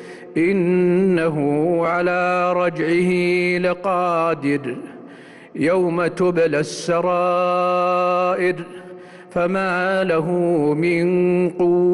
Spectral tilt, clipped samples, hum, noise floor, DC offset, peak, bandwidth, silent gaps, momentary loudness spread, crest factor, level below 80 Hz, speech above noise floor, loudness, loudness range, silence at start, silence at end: -7 dB/octave; under 0.1%; none; -41 dBFS; under 0.1%; -10 dBFS; 11.5 kHz; none; 6 LU; 10 dB; -58 dBFS; 23 dB; -19 LUFS; 2 LU; 0 s; 0 s